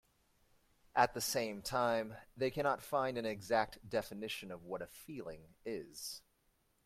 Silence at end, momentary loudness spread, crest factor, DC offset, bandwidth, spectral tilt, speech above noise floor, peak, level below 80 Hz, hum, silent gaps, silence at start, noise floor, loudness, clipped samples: 0.65 s; 14 LU; 24 dB; under 0.1%; 16.5 kHz; -3.5 dB/octave; 38 dB; -16 dBFS; -68 dBFS; none; none; 0.95 s; -77 dBFS; -38 LUFS; under 0.1%